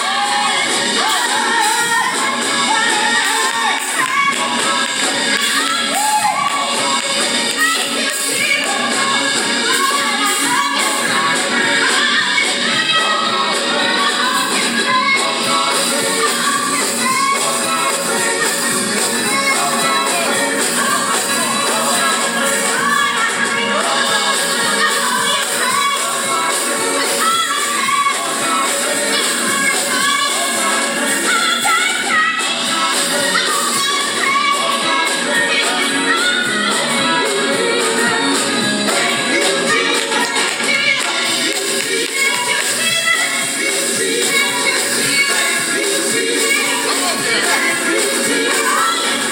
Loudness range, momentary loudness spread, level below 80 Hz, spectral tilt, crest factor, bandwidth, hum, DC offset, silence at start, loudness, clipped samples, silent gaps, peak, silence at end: 1 LU; 2 LU; -66 dBFS; -0.5 dB/octave; 14 dB; 20 kHz; none; under 0.1%; 0 s; -14 LUFS; under 0.1%; none; -2 dBFS; 0 s